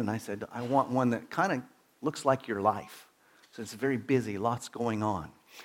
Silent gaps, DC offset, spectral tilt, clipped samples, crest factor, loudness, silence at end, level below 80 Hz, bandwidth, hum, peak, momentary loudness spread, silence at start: none; under 0.1%; -6 dB/octave; under 0.1%; 20 dB; -31 LUFS; 0 s; -68 dBFS; 17 kHz; none; -10 dBFS; 15 LU; 0 s